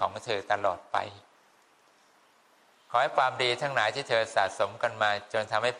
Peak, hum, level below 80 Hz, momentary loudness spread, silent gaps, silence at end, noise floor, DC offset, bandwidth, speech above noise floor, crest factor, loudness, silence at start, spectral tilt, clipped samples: -10 dBFS; none; -76 dBFS; 7 LU; none; 0 s; -63 dBFS; under 0.1%; 11.5 kHz; 34 dB; 20 dB; -28 LUFS; 0 s; -3 dB/octave; under 0.1%